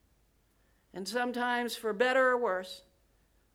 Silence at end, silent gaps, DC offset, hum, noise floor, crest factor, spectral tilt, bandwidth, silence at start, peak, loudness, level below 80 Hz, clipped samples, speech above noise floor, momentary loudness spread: 0.75 s; none; under 0.1%; none; -69 dBFS; 18 dB; -3 dB/octave; 16.5 kHz; 0.95 s; -14 dBFS; -30 LUFS; -72 dBFS; under 0.1%; 39 dB; 19 LU